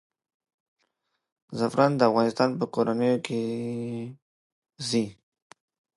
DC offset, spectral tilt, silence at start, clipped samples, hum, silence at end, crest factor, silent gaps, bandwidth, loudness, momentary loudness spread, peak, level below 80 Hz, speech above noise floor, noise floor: under 0.1%; -6 dB/octave; 1.5 s; under 0.1%; none; 0.85 s; 22 dB; 4.22-4.62 s; 11.5 kHz; -26 LUFS; 14 LU; -6 dBFS; -72 dBFS; 52 dB; -78 dBFS